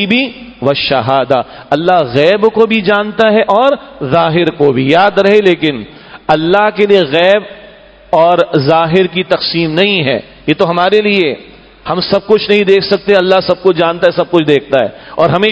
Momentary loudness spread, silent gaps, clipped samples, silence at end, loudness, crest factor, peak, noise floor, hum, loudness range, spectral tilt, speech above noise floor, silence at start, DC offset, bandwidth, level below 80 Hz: 7 LU; none; 0.7%; 0 s; -10 LUFS; 10 dB; 0 dBFS; -37 dBFS; none; 2 LU; -7 dB/octave; 27 dB; 0 s; under 0.1%; 8 kHz; -46 dBFS